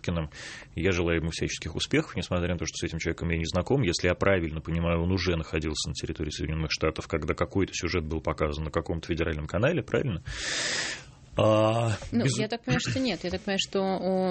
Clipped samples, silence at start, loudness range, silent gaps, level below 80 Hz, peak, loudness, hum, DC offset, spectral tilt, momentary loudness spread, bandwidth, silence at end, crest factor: under 0.1%; 0.05 s; 2 LU; none; -42 dBFS; -8 dBFS; -28 LUFS; none; under 0.1%; -5 dB/octave; 7 LU; 8.8 kHz; 0 s; 20 dB